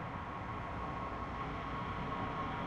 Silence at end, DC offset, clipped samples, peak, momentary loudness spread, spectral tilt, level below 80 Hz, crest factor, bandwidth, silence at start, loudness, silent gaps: 0 s; under 0.1%; under 0.1%; -28 dBFS; 3 LU; -7 dB/octave; -52 dBFS; 12 dB; 10.5 kHz; 0 s; -41 LUFS; none